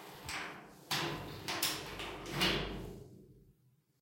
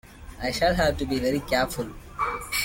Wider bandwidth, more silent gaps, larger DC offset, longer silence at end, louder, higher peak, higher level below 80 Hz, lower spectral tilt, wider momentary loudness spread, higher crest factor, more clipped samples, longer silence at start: about the same, 16.5 kHz vs 17 kHz; neither; neither; first, 0.5 s vs 0 s; second, -37 LUFS vs -26 LUFS; second, -18 dBFS vs -10 dBFS; second, -56 dBFS vs -40 dBFS; about the same, -3 dB/octave vs -4 dB/octave; first, 17 LU vs 11 LU; first, 22 dB vs 16 dB; neither; about the same, 0 s vs 0.05 s